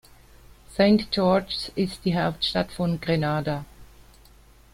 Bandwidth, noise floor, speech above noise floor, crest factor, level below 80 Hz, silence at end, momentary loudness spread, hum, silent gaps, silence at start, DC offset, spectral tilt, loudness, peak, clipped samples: 15.5 kHz; -53 dBFS; 29 dB; 20 dB; -50 dBFS; 0.9 s; 9 LU; none; none; 0.7 s; under 0.1%; -6.5 dB/octave; -24 LUFS; -6 dBFS; under 0.1%